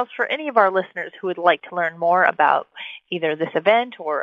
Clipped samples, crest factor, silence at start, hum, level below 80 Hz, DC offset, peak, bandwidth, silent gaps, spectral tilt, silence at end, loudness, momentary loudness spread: under 0.1%; 18 dB; 0 s; none; -76 dBFS; under 0.1%; -2 dBFS; 5.4 kHz; none; -6.5 dB/octave; 0 s; -20 LUFS; 11 LU